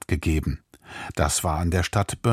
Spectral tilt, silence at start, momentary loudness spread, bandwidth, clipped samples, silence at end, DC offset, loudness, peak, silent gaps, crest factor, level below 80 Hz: -5 dB/octave; 0.1 s; 15 LU; 16 kHz; under 0.1%; 0 s; under 0.1%; -25 LUFS; -6 dBFS; none; 18 dB; -34 dBFS